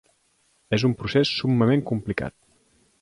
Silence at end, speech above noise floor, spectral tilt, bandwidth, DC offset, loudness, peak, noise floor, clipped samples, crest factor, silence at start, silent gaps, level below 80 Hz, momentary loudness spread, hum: 0.7 s; 43 dB; -6.5 dB/octave; 11 kHz; under 0.1%; -23 LUFS; -8 dBFS; -66 dBFS; under 0.1%; 18 dB; 0.7 s; none; -52 dBFS; 9 LU; none